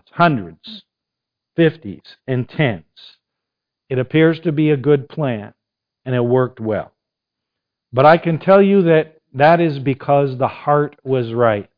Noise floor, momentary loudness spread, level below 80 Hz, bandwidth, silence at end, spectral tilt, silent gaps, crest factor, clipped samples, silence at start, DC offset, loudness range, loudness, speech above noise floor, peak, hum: -82 dBFS; 17 LU; -56 dBFS; 5.2 kHz; 0.15 s; -10 dB/octave; none; 18 dB; under 0.1%; 0.15 s; under 0.1%; 8 LU; -16 LUFS; 67 dB; 0 dBFS; none